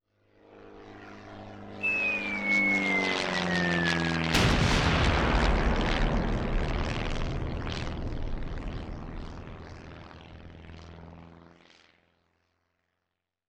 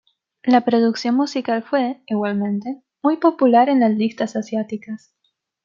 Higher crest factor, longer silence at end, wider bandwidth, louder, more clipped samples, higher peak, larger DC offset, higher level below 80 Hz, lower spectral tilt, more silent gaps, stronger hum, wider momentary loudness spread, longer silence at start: about the same, 20 dB vs 16 dB; first, 2.1 s vs 0.7 s; first, 14 kHz vs 7.4 kHz; second, -28 LUFS vs -19 LUFS; neither; second, -10 dBFS vs -2 dBFS; neither; first, -36 dBFS vs -72 dBFS; second, -5 dB/octave vs -6.5 dB/octave; neither; neither; first, 23 LU vs 12 LU; about the same, 0.5 s vs 0.45 s